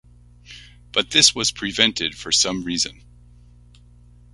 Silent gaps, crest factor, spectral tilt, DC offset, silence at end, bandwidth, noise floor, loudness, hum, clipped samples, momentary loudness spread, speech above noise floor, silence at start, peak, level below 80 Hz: none; 24 dB; -1 dB/octave; under 0.1%; 1.4 s; 11.5 kHz; -48 dBFS; -18 LUFS; 60 Hz at -45 dBFS; under 0.1%; 10 LU; 28 dB; 0.5 s; 0 dBFS; -50 dBFS